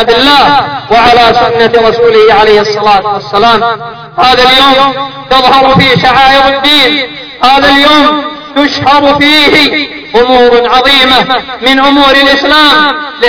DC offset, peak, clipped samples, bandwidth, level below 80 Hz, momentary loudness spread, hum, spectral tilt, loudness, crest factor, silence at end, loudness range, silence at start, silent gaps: under 0.1%; 0 dBFS; 7%; 5.4 kHz; -32 dBFS; 7 LU; none; -4.5 dB/octave; -4 LUFS; 6 dB; 0 s; 1 LU; 0 s; none